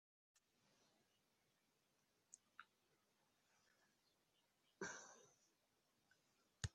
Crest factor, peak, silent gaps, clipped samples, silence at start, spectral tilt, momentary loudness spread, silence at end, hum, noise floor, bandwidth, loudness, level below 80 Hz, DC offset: 34 dB; -28 dBFS; none; under 0.1%; 2.3 s; -3.5 dB/octave; 14 LU; 0.05 s; none; -85 dBFS; 9.6 kHz; -57 LUFS; -76 dBFS; under 0.1%